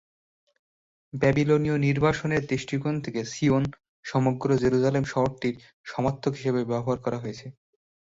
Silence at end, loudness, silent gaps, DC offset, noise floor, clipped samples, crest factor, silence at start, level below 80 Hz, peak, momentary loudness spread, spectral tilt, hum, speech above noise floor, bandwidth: 0.6 s; -26 LUFS; 3.88-4.03 s, 5.73-5.84 s; under 0.1%; under -90 dBFS; under 0.1%; 18 dB; 1.15 s; -54 dBFS; -8 dBFS; 12 LU; -7 dB/octave; none; over 65 dB; 7.8 kHz